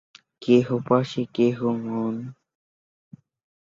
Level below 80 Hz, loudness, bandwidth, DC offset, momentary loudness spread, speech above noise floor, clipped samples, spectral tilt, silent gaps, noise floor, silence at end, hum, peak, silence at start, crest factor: -66 dBFS; -23 LUFS; 7.4 kHz; under 0.1%; 14 LU; over 68 dB; under 0.1%; -7.5 dB/octave; none; under -90 dBFS; 1.35 s; none; -6 dBFS; 0.4 s; 20 dB